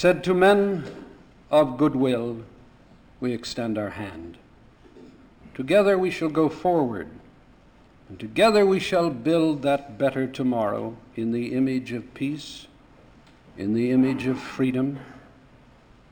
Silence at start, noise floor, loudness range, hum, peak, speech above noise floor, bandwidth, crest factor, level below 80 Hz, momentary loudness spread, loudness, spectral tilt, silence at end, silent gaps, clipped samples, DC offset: 0 s; -53 dBFS; 6 LU; none; -6 dBFS; 30 dB; 20 kHz; 18 dB; -56 dBFS; 17 LU; -23 LUFS; -6.5 dB/octave; 0.95 s; none; under 0.1%; under 0.1%